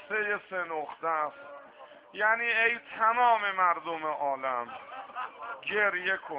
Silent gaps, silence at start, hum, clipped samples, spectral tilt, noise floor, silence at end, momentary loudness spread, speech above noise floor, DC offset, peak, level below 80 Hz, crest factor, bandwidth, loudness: none; 0 s; none; under 0.1%; -6.5 dB/octave; -52 dBFS; 0 s; 16 LU; 23 dB; under 0.1%; -12 dBFS; -78 dBFS; 18 dB; 5.2 kHz; -29 LUFS